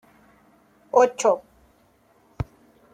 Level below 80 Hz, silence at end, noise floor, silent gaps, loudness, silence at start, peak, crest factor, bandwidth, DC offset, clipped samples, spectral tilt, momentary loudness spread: -52 dBFS; 0.5 s; -60 dBFS; none; -23 LUFS; 0.95 s; -4 dBFS; 22 dB; 10.5 kHz; under 0.1%; under 0.1%; -4.5 dB/octave; 16 LU